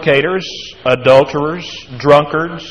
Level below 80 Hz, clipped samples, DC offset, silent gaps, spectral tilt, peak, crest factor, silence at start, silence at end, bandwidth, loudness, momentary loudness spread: -48 dBFS; 0.3%; 0.5%; none; -5.5 dB/octave; 0 dBFS; 14 dB; 0 s; 0 s; 10 kHz; -13 LUFS; 14 LU